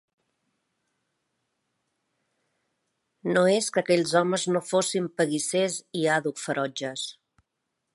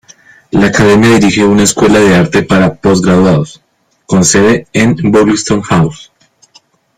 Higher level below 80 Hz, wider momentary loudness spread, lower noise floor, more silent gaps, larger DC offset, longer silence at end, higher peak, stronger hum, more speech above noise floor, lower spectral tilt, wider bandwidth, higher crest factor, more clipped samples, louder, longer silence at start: second, -76 dBFS vs -36 dBFS; first, 9 LU vs 6 LU; first, -81 dBFS vs -47 dBFS; neither; neither; second, 0.85 s vs 1 s; second, -8 dBFS vs 0 dBFS; neither; first, 56 dB vs 39 dB; about the same, -4 dB/octave vs -5 dB/octave; second, 11.5 kHz vs 15.5 kHz; first, 22 dB vs 10 dB; neither; second, -25 LUFS vs -8 LUFS; first, 3.25 s vs 0.55 s